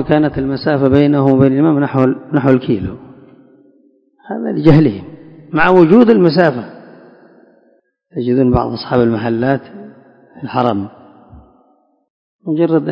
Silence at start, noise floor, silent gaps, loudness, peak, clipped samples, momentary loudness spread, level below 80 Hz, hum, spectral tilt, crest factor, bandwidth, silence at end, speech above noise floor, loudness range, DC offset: 0 s; -56 dBFS; 12.10-12.39 s; -13 LUFS; 0 dBFS; 0.4%; 17 LU; -40 dBFS; none; -10 dB/octave; 14 dB; 5.6 kHz; 0 s; 44 dB; 7 LU; under 0.1%